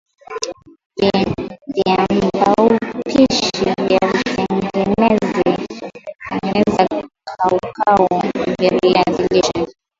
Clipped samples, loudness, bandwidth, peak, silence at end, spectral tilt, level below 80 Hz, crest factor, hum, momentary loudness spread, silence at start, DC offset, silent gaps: under 0.1%; -16 LUFS; 7.8 kHz; 0 dBFS; 0.3 s; -5.5 dB/octave; -46 dBFS; 16 dB; none; 12 LU; 0.3 s; under 0.1%; 0.86-0.90 s